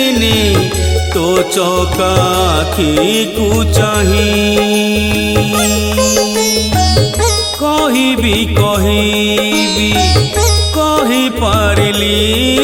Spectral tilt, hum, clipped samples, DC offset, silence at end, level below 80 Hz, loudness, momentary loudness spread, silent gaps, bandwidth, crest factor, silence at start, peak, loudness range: -4 dB/octave; none; under 0.1%; under 0.1%; 0 s; -24 dBFS; -11 LUFS; 2 LU; none; 17 kHz; 12 dB; 0 s; 0 dBFS; 1 LU